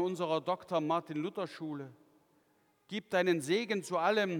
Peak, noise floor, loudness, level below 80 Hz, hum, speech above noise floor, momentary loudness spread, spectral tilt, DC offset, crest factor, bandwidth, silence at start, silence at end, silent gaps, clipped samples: -16 dBFS; -72 dBFS; -34 LUFS; -86 dBFS; none; 38 dB; 12 LU; -5 dB/octave; under 0.1%; 18 dB; 18 kHz; 0 s; 0 s; none; under 0.1%